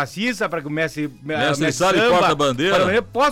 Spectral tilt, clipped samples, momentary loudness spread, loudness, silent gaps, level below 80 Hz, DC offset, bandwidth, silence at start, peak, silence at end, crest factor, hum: -4.5 dB/octave; under 0.1%; 9 LU; -19 LUFS; none; -50 dBFS; under 0.1%; 16.5 kHz; 0 s; -10 dBFS; 0 s; 10 dB; none